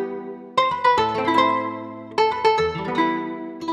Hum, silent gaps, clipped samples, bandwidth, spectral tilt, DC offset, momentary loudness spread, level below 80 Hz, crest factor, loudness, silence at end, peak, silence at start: none; none; under 0.1%; 11 kHz; -5 dB/octave; under 0.1%; 12 LU; -54 dBFS; 18 dB; -21 LUFS; 0 s; -4 dBFS; 0 s